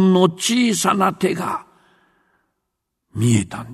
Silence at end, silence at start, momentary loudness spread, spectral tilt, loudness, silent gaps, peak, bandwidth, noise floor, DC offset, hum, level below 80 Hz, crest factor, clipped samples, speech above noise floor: 0 s; 0 s; 10 LU; -5 dB/octave; -18 LUFS; none; 0 dBFS; 13.5 kHz; -77 dBFS; under 0.1%; none; -56 dBFS; 18 dB; under 0.1%; 60 dB